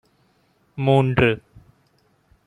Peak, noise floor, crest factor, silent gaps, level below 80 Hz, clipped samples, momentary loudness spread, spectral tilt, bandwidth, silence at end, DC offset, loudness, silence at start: -2 dBFS; -63 dBFS; 20 dB; none; -48 dBFS; under 0.1%; 15 LU; -8 dB/octave; 9.8 kHz; 1.1 s; under 0.1%; -20 LUFS; 0.75 s